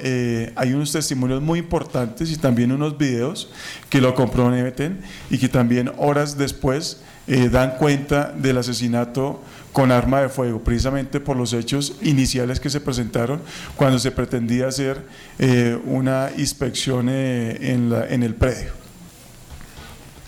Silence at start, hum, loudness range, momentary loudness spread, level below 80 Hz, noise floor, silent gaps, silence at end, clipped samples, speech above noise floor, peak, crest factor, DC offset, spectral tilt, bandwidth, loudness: 0 s; none; 2 LU; 9 LU; -38 dBFS; -42 dBFS; none; 0 s; under 0.1%; 22 dB; -8 dBFS; 12 dB; under 0.1%; -5.5 dB/octave; 16 kHz; -21 LUFS